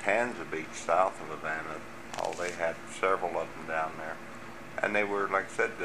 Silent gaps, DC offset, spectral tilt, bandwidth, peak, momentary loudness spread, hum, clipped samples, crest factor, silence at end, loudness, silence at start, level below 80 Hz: none; 0.4%; -4 dB/octave; 15.5 kHz; -10 dBFS; 13 LU; none; under 0.1%; 22 dB; 0 s; -32 LUFS; 0 s; -66 dBFS